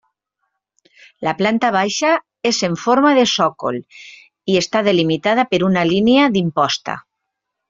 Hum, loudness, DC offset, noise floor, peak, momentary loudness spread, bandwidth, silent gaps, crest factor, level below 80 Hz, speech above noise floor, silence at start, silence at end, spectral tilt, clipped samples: none; -16 LUFS; under 0.1%; -78 dBFS; -2 dBFS; 11 LU; 7.8 kHz; none; 16 dB; -58 dBFS; 62 dB; 1.2 s; 0.7 s; -4.5 dB/octave; under 0.1%